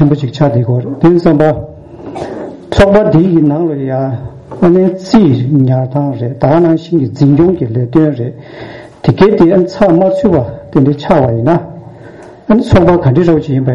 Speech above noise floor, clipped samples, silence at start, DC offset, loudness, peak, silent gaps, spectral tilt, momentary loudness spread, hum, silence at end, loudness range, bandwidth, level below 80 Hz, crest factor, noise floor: 23 dB; 0.1%; 0 s; under 0.1%; -10 LUFS; 0 dBFS; none; -9 dB/octave; 15 LU; none; 0 s; 2 LU; 8 kHz; -32 dBFS; 10 dB; -32 dBFS